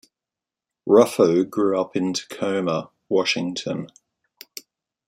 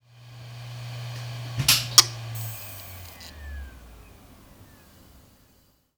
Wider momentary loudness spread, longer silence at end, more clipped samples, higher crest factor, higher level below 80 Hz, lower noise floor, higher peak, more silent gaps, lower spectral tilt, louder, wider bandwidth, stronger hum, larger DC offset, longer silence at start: second, 22 LU vs 25 LU; first, 1.2 s vs 0.75 s; neither; second, 20 dB vs 30 dB; second, -68 dBFS vs -48 dBFS; first, -88 dBFS vs -62 dBFS; about the same, -2 dBFS vs 0 dBFS; neither; first, -5 dB/octave vs -1 dB/octave; about the same, -21 LUFS vs -22 LUFS; second, 16.5 kHz vs over 20 kHz; neither; neither; first, 0.85 s vs 0.15 s